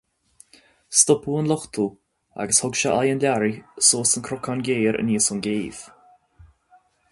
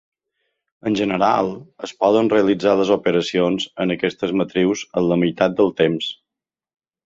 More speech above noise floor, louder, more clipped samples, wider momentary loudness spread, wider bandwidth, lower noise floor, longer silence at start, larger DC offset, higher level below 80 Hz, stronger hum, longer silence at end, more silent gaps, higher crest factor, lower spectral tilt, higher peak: second, 37 dB vs 69 dB; about the same, -21 LUFS vs -19 LUFS; neither; first, 12 LU vs 9 LU; first, 12 kHz vs 7.8 kHz; second, -58 dBFS vs -87 dBFS; about the same, 0.9 s vs 0.85 s; neither; about the same, -58 dBFS vs -56 dBFS; neither; first, 1.25 s vs 0.9 s; neither; about the same, 22 dB vs 18 dB; second, -3 dB/octave vs -6 dB/octave; about the same, -2 dBFS vs -2 dBFS